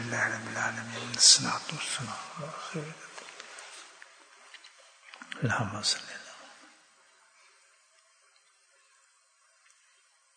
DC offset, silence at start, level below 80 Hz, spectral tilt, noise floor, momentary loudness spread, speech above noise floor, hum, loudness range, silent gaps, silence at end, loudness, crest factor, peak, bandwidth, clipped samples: under 0.1%; 0 s; -76 dBFS; -1 dB/octave; -66 dBFS; 29 LU; 36 dB; none; 16 LU; none; 3.7 s; -27 LUFS; 28 dB; -6 dBFS; 9.6 kHz; under 0.1%